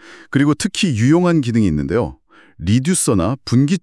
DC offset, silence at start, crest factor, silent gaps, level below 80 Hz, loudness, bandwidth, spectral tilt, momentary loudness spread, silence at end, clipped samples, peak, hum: under 0.1%; 0.05 s; 14 dB; none; -42 dBFS; -16 LUFS; 12 kHz; -5.5 dB/octave; 6 LU; 0.05 s; under 0.1%; -2 dBFS; none